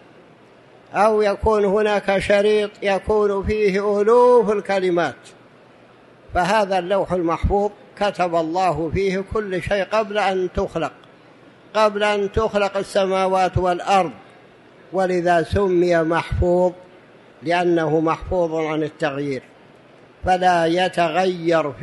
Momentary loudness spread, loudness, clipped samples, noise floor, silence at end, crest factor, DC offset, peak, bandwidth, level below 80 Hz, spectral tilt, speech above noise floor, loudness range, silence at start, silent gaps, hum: 7 LU; -19 LUFS; under 0.1%; -48 dBFS; 0 s; 16 dB; under 0.1%; -4 dBFS; 11.5 kHz; -38 dBFS; -6 dB/octave; 30 dB; 4 LU; 0.9 s; none; none